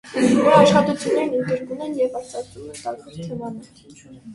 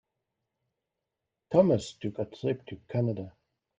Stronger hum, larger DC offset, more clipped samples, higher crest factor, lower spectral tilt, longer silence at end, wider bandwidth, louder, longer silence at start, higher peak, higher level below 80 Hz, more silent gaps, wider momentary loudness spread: neither; neither; neither; about the same, 20 dB vs 24 dB; second, -5.5 dB/octave vs -7.5 dB/octave; second, 0 s vs 0.5 s; first, 11.5 kHz vs 9.4 kHz; first, -18 LUFS vs -30 LUFS; second, 0.05 s vs 1.5 s; first, 0 dBFS vs -8 dBFS; first, -56 dBFS vs -66 dBFS; neither; first, 20 LU vs 13 LU